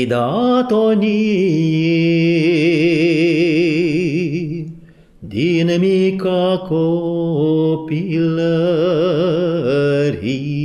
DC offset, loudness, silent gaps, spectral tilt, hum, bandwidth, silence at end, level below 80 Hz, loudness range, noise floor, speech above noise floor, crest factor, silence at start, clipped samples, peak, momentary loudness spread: under 0.1%; -16 LUFS; none; -7.5 dB/octave; none; 9.8 kHz; 0 s; -52 dBFS; 3 LU; -41 dBFS; 27 dB; 10 dB; 0 s; under 0.1%; -4 dBFS; 6 LU